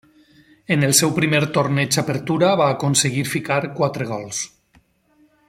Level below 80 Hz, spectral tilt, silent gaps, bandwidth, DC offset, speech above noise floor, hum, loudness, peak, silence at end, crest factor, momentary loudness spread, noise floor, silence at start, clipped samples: -58 dBFS; -4 dB/octave; none; 16.5 kHz; under 0.1%; 39 dB; none; -19 LUFS; 0 dBFS; 1 s; 20 dB; 10 LU; -58 dBFS; 0.7 s; under 0.1%